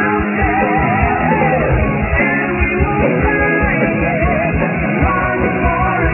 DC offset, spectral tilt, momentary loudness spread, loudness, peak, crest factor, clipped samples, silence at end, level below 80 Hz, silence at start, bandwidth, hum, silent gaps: under 0.1%; -11 dB/octave; 2 LU; -14 LUFS; -2 dBFS; 12 dB; under 0.1%; 0 s; -24 dBFS; 0 s; 3 kHz; none; none